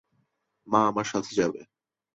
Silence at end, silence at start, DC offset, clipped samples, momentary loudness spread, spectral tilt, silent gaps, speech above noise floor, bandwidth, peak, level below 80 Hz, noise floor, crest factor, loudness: 0.5 s; 0.65 s; under 0.1%; under 0.1%; 6 LU; -5 dB/octave; none; 48 dB; 8.2 kHz; -6 dBFS; -66 dBFS; -74 dBFS; 22 dB; -26 LUFS